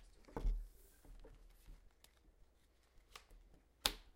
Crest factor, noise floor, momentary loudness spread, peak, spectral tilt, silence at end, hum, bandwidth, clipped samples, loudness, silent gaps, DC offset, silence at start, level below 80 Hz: 38 dB; -72 dBFS; 28 LU; -12 dBFS; -2.5 dB/octave; 0.05 s; none; 16 kHz; under 0.1%; -44 LUFS; none; under 0.1%; 0 s; -50 dBFS